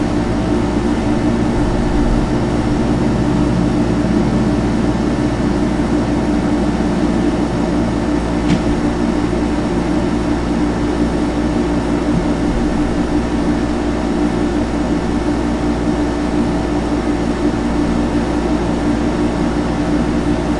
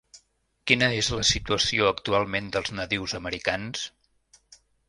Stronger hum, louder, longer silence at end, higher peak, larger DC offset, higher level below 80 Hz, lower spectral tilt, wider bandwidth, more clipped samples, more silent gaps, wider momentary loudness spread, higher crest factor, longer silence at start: neither; first, -16 LUFS vs -25 LUFS; second, 0 s vs 0.35 s; about the same, -2 dBFS vs -2 dBFS; neither; first, -24 dBFS vs -48 dBFS; first, -7 dB/octave vs -3 dB/octave; about the same, 11 kHz vs 11.5 kHz; neither; neither; second, 2 LU vs 10 LU; second, 14 dB vs 24 dB; second, 0 s vs 0.15 s